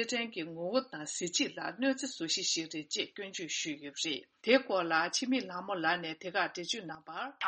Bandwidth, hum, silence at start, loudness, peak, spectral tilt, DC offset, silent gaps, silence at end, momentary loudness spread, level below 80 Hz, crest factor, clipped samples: 8.4 kHz; none; 0 s; -34 LUFS; -12 dBFS; -2 dB/octave; under 0.1%; none; 0 s; 9 LU; -82 dBFS; 22 dB; under 0.1%